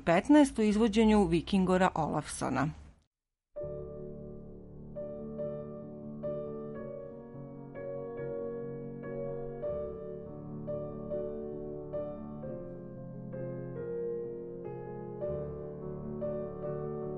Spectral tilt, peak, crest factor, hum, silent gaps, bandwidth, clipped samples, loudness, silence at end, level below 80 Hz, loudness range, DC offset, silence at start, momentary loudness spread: -6.5 dB/octave; -12 dBFS; 22 dB; none; 3.07-3.11 s; 11.5 kHz; under 0.1%; -34 LUFS; 0 s; -54 dBFS; 12 LU; under 0.1%; 0 s; 18 LU